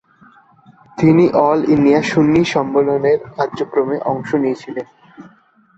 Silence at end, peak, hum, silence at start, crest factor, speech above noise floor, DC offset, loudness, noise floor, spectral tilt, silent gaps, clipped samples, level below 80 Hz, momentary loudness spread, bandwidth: 0.55 s; -2 dBFS; none; 0.95 s; 14 dB; 37 dB; under 0.1%; -15 LUFS; -51 dBFS; -7 dB/octave; none; under 0.1%; -52 dBFS; 13 LU; 8 kHz